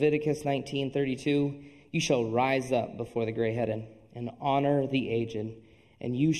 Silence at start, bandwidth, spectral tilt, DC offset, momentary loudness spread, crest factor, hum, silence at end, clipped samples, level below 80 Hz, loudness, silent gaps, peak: 0 s; 12.5 kHz; -6 dB/octave; under 0.1%; 12 LU; 18 dB; none; 0 s; under 0.1%; -62 dBFS; -30 LUFS; none; -12 dBFS